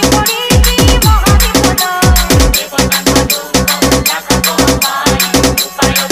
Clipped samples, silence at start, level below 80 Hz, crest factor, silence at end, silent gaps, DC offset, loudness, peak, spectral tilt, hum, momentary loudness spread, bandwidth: under 0.1%; 0 s; -16 dBFS; 10 dB; 0 s; none; under 0.1%; -9 LUFS; 0 dBFS; -3.5 dB/octave; none; 3 LU; 16.5 kHz